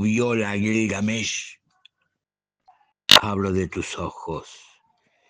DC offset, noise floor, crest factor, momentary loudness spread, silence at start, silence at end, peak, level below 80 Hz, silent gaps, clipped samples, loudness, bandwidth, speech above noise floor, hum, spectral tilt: under 0.1%; -85 dBFS; 24 dB; 19 LU; 0 s; 0.7 s; 0 dBFS; -56 dBFS; none; under 0.1%; -20 LUFS; 10.5 kHz; 60 dB; none; -3.5 dB/octave